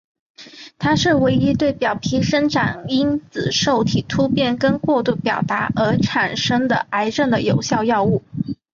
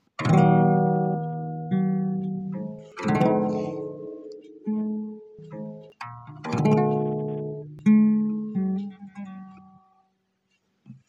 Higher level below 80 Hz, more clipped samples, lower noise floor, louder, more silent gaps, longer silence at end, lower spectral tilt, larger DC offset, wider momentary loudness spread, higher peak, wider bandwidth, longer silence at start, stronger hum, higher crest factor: first, -46 dBFS vs -66 dBFS; neither; second, -40 dBFS vs -72 dBFS; first, -18 LUFS vs -24 LUFS; neither; about the same, 0.2 s vs 0.15 s; second, -5.5 dB/octave vs -9 dB/octave; neither; second, 4 LU vs 21 LU; first, -4 dBFS vs -8 dBFS; about the same, 7.4 kHz vs 7.6 kHz; first, 0.4 s vs 0.2 s; neither; about the same, 14 dB vs 18 dB